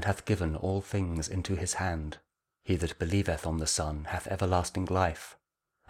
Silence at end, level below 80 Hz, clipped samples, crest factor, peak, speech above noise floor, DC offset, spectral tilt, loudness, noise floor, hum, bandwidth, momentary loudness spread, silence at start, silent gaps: 0.55 s; -44 dBFS; under 0.1%; 20 dB; -12 dBFS; 41 dB; under 0.1%; -5 dB/octave; -31 LUFS; -72 dBFS; none; 15 kHz; 9 LU; 0 s; none